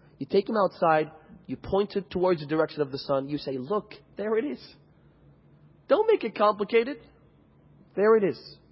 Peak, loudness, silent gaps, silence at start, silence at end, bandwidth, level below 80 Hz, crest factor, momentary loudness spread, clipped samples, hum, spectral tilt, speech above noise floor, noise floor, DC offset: -8 dBFS; -26 LUFS; none; 0.2 s; 0.2 s; 5.8 kHz; -60 dBFS; 18 dB; 14 LU; under 0.1%; none; -10 dB/octave; 32 dB; -58 dBFS; under 0.1%